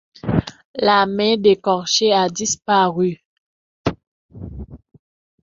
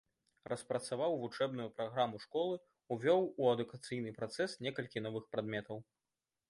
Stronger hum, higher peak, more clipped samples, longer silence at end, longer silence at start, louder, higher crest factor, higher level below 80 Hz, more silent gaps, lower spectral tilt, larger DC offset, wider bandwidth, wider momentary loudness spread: neither; first, -2 dBFS vs -20 dBFS; neither; about the same, 0.65 s vs 0.65 s; second, 0.25 s vs 0.5 s; first, -18 LUFS vs -38 LUFS; about the same, 18 dB vs 20 dB; first, -44 dBFS vs -80 dBFS; first, 0.65-0.74 s, 3.25-3.84 s, 4.07-4.29 s vs none; second, -4 dB/octave vs -5.5 dB/octave; neither; second, 7.6 kHz vs 11.5 kHz; first, 20 LU vs 12 LU